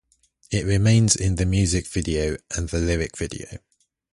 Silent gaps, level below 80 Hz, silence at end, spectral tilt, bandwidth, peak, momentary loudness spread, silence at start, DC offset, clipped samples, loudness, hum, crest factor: none; -34 dBFS; 0.55 s; -5 dB/octave; 11.5 kHz; -4 dBFS; 13 LU; 0.5 s; under 0.1%; under 0.1%; -22 LUFS; none; 18 dB